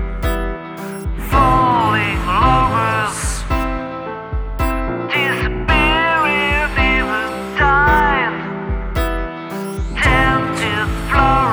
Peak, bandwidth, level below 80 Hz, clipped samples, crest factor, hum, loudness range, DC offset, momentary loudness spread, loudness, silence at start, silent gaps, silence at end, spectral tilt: 0 dBFS; over 20 kHz; -24 dBFS; under 0.1%; 16 dB; none; 3 LU; under 0.1%; 13 LU; -16 LUFS; 0 s; none; 0 s; -5 dB/octave